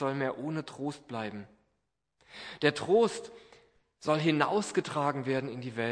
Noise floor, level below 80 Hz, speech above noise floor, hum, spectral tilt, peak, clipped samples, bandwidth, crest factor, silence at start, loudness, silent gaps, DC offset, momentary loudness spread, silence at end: -81 dBFS; -74 dBFS; 50 dB; none; -5.5 dB/octave; -8 dBFS; under 0.1%; 10.5 kHz; 24 dB; 0 s; -31 LUFS; none; under 0.1%; 17 LU; 0 s